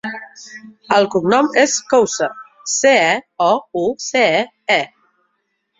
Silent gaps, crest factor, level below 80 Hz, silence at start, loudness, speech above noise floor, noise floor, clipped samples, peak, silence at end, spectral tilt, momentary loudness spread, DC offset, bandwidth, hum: none; 16 dB; -62 dBFS; 0.05 s; -16 LUFS; 54 dB; -69 dBFS; under 0.1%; -2 dBFS; 0.95 s; -2.5 dB/octave; 17 LU; under 0.1%; 7.8 kHz; none